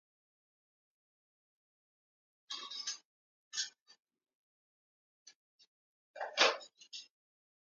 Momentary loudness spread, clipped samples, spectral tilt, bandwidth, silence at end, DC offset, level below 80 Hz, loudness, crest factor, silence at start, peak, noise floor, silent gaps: 20 LU; under 0.1%; 2 dB/octave; 9.6 kHz; 0.6 s; under 0.1%; under -90 dBFS; -36 LUFS; 30 dB; 2.5 s; -14 dBFS; under -90 dBFS; 3.05-3.51 s, 3.82-3.86 s, 4.35-5.26 s, 5.35-5.59 s, 5.67-6.14 s